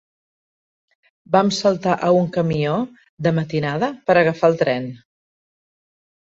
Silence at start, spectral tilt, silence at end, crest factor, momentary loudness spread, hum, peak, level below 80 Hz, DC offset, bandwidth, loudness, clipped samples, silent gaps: 1.3 s; -6.5 dB/octave; 1.35 s; 18 dB; 7 LU; none; -2 dBFS; -58 dBFS; under 0.1%; 8 kHz; -19 LUFS; under 0.1%; 3.09-3.17 s